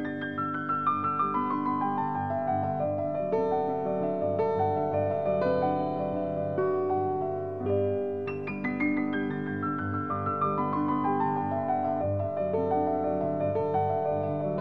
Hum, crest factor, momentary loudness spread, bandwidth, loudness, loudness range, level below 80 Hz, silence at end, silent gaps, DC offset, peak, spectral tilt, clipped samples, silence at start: none; 12 dB; 4 LU; 6 kHz; -29 LUFS; 2 LU; -54 dBFS; 0 s; none; 0.2%; -16 dBFS; -10 dB/octave; under 0.1%; 0 s